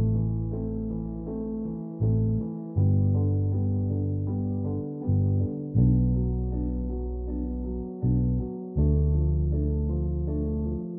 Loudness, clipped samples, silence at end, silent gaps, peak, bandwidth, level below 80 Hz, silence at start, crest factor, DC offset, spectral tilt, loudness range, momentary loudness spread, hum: -27 LUFS; under 0.1%; 0 s; none; -10 dBFS; 1.3 kHz; -32 dBFS; 0 s; 16 dB; under 0.1%; -15.5 dB/octave; 2 LU; 9 LU; none